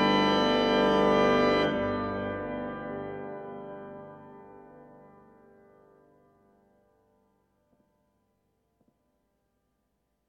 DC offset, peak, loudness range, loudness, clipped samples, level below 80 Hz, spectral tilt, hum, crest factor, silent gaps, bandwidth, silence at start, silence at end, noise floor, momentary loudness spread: under 0.1%; -12 dBFS; 23 LU; -26 LUFS; under 0.1%; -56 dBFS; -6 dB/octave; 50 Hz at -60 dBFS; 18 dB; none; 9.2 kHz; 0 s; 5.45 s; -77 dBFS; 21 LU